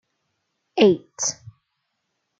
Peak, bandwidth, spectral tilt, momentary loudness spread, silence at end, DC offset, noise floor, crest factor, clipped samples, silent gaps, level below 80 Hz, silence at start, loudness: -4 dBFS; 9.2 kHz; -3.5 dB/octave; 14 LU; 1.05 s; under 0.1%; -76 dBFS; 20 dB; under 0.1%; none; -68 dBFS; 0.75 s; -21 LUFS